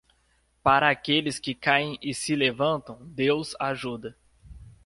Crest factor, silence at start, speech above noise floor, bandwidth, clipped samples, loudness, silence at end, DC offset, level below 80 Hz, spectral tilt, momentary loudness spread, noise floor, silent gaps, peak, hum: 22 dB; 0.65 s; 41 dB; 11.5 kHz; under 0.1%; -25 LUFS; 0.15 s; under 0.1%; -56 dBFS; -4 dB/octave; 12 LU; -67 dBFS; none; -6 dBFS; none